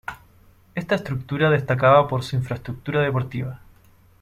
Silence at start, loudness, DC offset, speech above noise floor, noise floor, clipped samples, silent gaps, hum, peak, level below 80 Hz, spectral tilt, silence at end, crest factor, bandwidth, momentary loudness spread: 0.1 s; -22 LUFS; under 0.1%; 32 dB; -53 dBFS; under 0.1%; none; none; -4 dBFS; -52 dBFS; -7.5 dB/octave; 0.65 s; 20 dB; 13.5 kHz; 16 LU